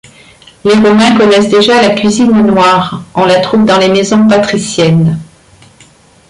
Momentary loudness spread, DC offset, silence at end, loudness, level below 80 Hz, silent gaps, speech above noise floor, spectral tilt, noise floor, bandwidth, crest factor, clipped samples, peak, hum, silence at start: 6 LU; under 0.1%; 1.05 s; -8 LUFS; -44 dBFS; none; 34 dB; -5.5 dB/octave; -41 dBFS; 11.5 kHz; 8 dB; under 0.1%; 0 dBFS; none; 0.65 s